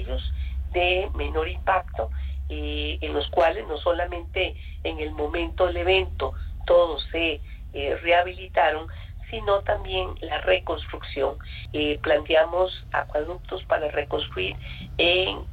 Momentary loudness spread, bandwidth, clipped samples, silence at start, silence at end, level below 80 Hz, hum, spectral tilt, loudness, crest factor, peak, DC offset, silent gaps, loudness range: 12 LU; 8.2 kHz; under 0.1%; 0 s; 0 s; -34 dBFS; none; -7 dB/octave; -25 LUFS; 16 dB; -8 dBFS; under 0.1%; none; 3 LU